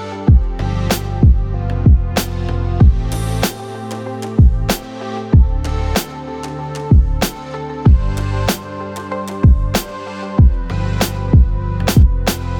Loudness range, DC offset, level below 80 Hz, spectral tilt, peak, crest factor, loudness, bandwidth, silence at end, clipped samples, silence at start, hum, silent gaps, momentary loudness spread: 2 LU; under 0.1%; -16 dBFS; -6 dB/octave; 0 dBFS; 14 dB; -16 LUFS; 19 kHz; 0 s; under 0.1%; 0 s; none; none; 13 LU